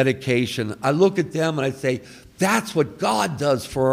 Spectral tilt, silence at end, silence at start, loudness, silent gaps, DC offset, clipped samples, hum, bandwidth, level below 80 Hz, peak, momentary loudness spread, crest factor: -5.5 dB/octave; 0 s; 0 s; -22 LUFS; none; under 0.1%; under 0.1%; none; 16 kHz; -54 dBFS; -4 dBFS; 6 LU; 16 dB